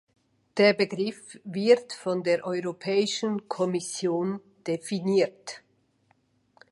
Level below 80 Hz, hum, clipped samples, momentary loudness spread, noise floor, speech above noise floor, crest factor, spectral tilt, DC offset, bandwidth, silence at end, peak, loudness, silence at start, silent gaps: -76 dBFS; none; under 0.1%; 14 LU; -68 dBFS; 42 dB; 20 dB; -4.5 dB/octave; under 0.1%; 11.5 kHz; 1.15 s; -8 dBFS; -27 LUFS; 0.55 s; none